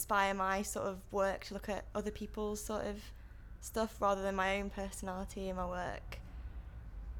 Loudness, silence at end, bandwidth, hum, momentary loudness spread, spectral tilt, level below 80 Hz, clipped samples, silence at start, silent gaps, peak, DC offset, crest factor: -38 LUFS; 0 s; 19 kHz; none; 16 LU; -4.5 dB/octave; -50 dBFS; under 0.1%; 0 s; none; -20 dBFS; under 0.1%; 20 dB